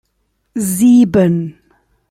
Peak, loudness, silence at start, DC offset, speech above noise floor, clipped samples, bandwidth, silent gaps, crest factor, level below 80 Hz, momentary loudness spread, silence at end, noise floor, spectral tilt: -2 dBFS; -12 LUFS; 0.55 s; under 0.1%; 54 dB; under 0.1%; 15.5 kHz; none; 12 dB; -48 dBFS; 17 LU; 0.6 s; -65 dBFS; -6.5 dB/octave